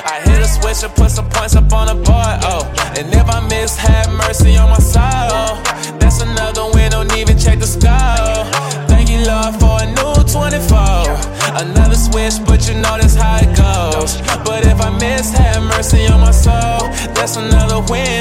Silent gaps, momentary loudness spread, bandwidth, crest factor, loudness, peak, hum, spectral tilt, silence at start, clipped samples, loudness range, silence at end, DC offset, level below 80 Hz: none; 6 LU; 16 kHz; 10 dB; -13 LUFS; 0 dBFS; none; -4.5 dB/octave; 0 s; under 0.1%; 1 LU; 0 s; under 0.1%; -12 dBFS